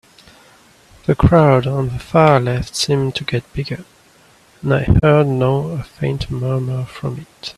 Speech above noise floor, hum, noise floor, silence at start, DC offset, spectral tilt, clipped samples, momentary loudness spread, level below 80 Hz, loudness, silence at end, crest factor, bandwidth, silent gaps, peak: 34 dB; none; -50 dBFS; 1.1 s; under 0.1%; -6.5 dB/octave; under 0.1%; 14 LU; -32 dBFS; -17 LUFS; 0.05 s; 16 dB; 13 kHz; none; 0 dBFS